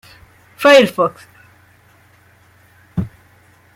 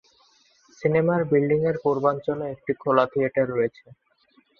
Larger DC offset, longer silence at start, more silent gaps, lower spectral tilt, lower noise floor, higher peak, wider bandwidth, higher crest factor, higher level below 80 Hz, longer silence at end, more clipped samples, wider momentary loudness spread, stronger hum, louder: neither; second, 0.6 s vs 0.8 s; neither; second, -4.5 dB/octave vs -8.5 dB/octave; second, -50 dBFS vs -63 dBFS; about the same, -2 dBFS vs -4 dBFS; first, 16 kHz vs 6.8 kHz; about the same, 18 dB vs 20 dB; first, -50 dBFS vs -62 dBFS; second, 0.7 s vs 0.9 s; neither; first, 17 LU vs 8 LU; neither; first, -14 LUFS vs -23 LUFS